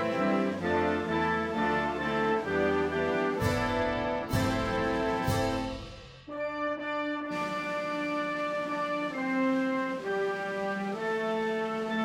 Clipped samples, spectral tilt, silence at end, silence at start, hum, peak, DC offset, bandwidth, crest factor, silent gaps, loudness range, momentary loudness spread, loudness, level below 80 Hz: under 0.1%; -6 dB/octave; 0 s; 0 s; none; -14 dBFS; under 0.1%; 16 kHz; 16 dB; none; 4 LU; 5 LU; -30 LUFS; -50 dBFS